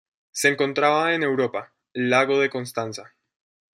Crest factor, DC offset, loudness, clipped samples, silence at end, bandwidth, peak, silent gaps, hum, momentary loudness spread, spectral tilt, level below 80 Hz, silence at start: 20 dB; under 0.1%; -22 LUFS; under 0.1%; 0.75 s; 14.5 kHz; -4 dBFS; none; none; 15 LU; -4 dB/octave; -74 dBFS; 0.35 s